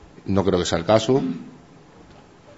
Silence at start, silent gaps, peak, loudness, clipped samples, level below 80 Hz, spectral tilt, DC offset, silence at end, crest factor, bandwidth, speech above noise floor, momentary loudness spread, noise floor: 0.25 s; none; -2 dBFS; -21 LUFS; under 0.1%; -50 dBFS; -5.5 dB/octave; under 0.1%; 1.05 s; 22 dB; 8 kHz; 28 dB; 15 LU; -48 dBFS